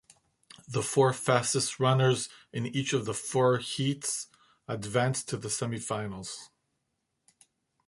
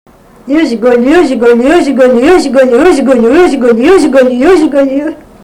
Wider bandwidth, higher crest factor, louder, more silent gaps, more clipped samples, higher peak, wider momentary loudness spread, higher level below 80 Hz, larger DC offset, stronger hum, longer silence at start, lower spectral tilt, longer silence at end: second, 11.5 kHz vs 13 kHz; first, 22 dB vs 6 dB; second, -29 LUFS vs -6 LUFS; neither; second, under 0.1% vs 1%; second, -8 dBFS vs 0 dBFS; first, 12 LU vs 5 LU; second, -66 dBFS vs -36 dBFS; neither; neither; first, 0.7 s vs 0.45 s; about the same, -4.5 dB/octave vs -5 dB/octave; first, 1.4 s vs 0.3 s